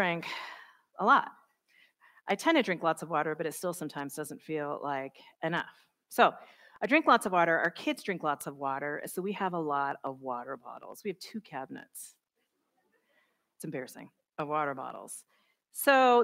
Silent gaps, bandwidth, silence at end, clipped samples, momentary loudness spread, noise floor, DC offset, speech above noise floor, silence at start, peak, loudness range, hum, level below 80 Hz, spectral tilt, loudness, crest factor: none; 16 kHz; 0 s; under 0.1%; 20 LU; -81 dBFS; under 0.1%; 50 dB; 0 s; -10 dBFS; 14 LU; none; -84 dBFS; -4 dB/octave; -31 LUFS; 22 dB